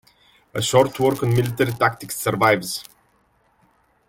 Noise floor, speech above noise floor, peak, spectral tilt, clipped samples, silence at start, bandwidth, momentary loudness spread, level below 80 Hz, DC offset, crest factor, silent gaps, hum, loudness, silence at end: -62 dBFS; 42 dB; -4 dBFS; -5 dB/octave; under 0.1%; 0.55 s; 17 kHz; 10 LU; -54 dBFS; under 0.1%; 18 dB; none; none; -20 LUFS; 1.25 s